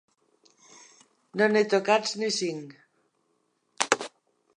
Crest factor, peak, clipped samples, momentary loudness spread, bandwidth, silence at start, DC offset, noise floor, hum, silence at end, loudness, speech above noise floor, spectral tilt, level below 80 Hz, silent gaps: 28 dB; 0 dBFS; under 0.1%; 17 LU; 11 kHz; 1.35 s; under 0.1%; -73 dBFS; none; 0.5 s; -26 LUFS; 48 dB; -3 dB/octave; -82 dBFS; none